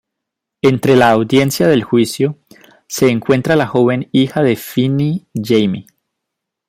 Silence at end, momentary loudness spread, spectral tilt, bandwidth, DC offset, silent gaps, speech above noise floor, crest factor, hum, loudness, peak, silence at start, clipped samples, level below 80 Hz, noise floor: 0.85 s; 8 LU; -6 dB/octave; 16.5 kHz; under 0.1%; none; 66 dB; 14 dB; none; -14 LUFS; 0 dBFS; 0.65 s; under 0.1%; -52 dBFS; -79 dBFS